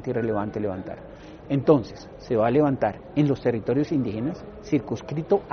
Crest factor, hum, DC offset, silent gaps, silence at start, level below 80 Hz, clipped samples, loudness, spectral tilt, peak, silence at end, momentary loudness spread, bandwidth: 20 dB; none; under 0.1%; none; 0 s; -52 dBFS; under 0.1%; -25 LUFS; -7.5 dB/octave; -4 dBFS; 0 s; 17 LU; 6.6 kHz